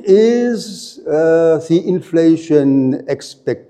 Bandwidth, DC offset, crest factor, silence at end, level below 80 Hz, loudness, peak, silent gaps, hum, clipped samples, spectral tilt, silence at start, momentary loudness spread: 12 kHz; under 0.1%; 14 dB; 0.1 s; -64 dBFS; -14 LUFS; 0 dBFS; none; none; under 0.1%; -7 dB/octave; 0.05 s; 11 LU